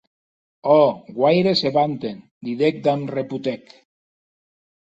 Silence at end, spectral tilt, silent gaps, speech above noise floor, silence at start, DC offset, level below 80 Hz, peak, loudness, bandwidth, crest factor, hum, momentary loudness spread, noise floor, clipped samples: 1.3 s; -7 dB/octave; 2.31-2.41 s; over 71 dB; 0.65 s; under 0.1%; -64 dBFS; -2 dBFS; -20 LUFS; 8 kHz; 18 dB; none; 15 LU; under -90 dBFS; under 0.1%